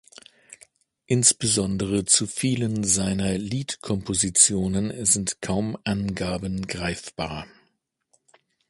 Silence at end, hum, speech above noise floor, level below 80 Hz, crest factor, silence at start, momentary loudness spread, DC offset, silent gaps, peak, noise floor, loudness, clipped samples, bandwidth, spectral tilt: 1.25 s; none; 47 dB; -48 dBFS; 24 dB; 0.5 s; 12 LU; under 0.1%; none; -2 dBFS; -71 dBFS; -23 LUFS; under 0.1%; 11.5 kHz; -3.5 dB/octave